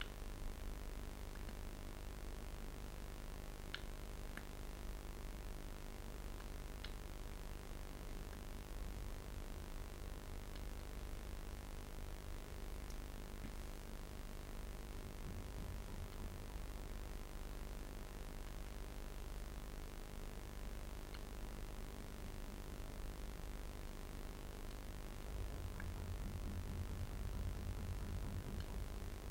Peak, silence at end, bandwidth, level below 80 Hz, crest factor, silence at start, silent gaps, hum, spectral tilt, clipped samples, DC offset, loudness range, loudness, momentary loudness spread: -24 dBFS; 0 s; 16.5 kHz; -48 dBFS; 22 dB; 0 s; none; none; -5 dB/octave; under 0.1%; under 0.1%; 4 LU; -51 LUFS; 5 LU